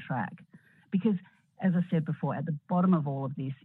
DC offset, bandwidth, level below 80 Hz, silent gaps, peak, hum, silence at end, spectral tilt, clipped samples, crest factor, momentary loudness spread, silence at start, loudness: under 0.1%; 3.9 kHz; -76 dBFS; none; -14 dBFS; none; 0.1 s; -11 dB/octave; under 0.1%; 18 dB; 9 LU; 0 s; -30 LUFS